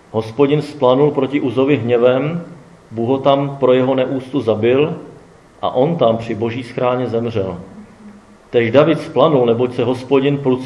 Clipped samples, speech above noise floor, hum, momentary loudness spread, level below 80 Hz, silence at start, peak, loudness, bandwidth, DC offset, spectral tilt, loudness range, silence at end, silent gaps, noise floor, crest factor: under 0.1%; 28 dB; none; 10 LU; -56 dBFS; 0.15 s; 0 dBFS; -16 LUFS; 11 kHz; under 0.1%; -8 dB/octave; 3 LU; 0 s; none; -43 dBFS; 16 dB